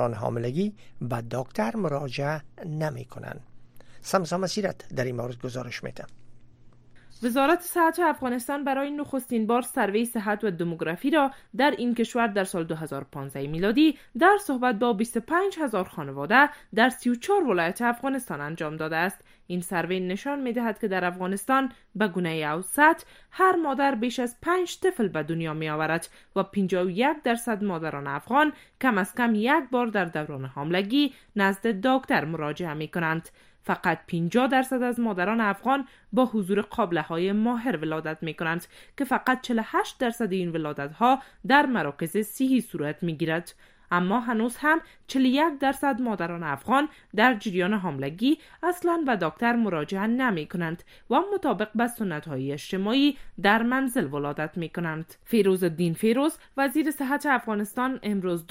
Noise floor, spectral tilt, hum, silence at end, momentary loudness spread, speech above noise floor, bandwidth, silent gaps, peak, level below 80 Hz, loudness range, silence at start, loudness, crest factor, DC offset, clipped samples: -51 dBFS; -5.5 dB/octave; none; 0.05 s; 10 LU; 25 dB; 16 kHz; none; -4 dBFS; -58 dBFS; 4 LU; 0 s; -26 LUFS; 22 dB; under 0.1%; under 0.1%